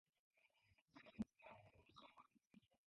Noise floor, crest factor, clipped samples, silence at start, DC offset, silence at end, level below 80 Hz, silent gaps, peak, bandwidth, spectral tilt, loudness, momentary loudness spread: -81 dBFS; 26 dB; under 0.1%; 0.35 s; under 0.1%; 0.1 s; -82 dBFS; 0.82-0.86 s; -36 dBFS; 6.2 kHz; -5.5 dB/octave; -59 LUFS; 14 LU